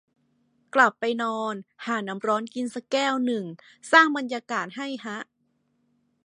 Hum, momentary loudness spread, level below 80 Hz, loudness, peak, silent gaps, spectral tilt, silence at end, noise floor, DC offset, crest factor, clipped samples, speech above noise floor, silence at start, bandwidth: none; 17 LU; -82 dBFS; -25 LUFS; -2 dBFS; none; -3.5 dB/octave; 1 s; -71 dBFS; under 0.1%; 24 dB; under 0.1%; 46 dB; 0.75 s; 11 kHz